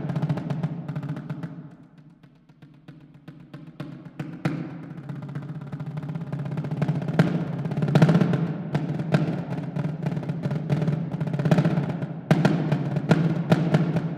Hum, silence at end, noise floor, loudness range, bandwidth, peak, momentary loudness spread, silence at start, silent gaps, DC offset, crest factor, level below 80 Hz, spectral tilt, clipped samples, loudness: none; 0 s; -53 dBFS; 13 LU; 9.4 kHz; -4 dBFS; 16 LU; 0 s; none; under 0.1%; 22 dB; -60 dBFS; -8.5 dB/octave; under 0.1%; -26 LUFS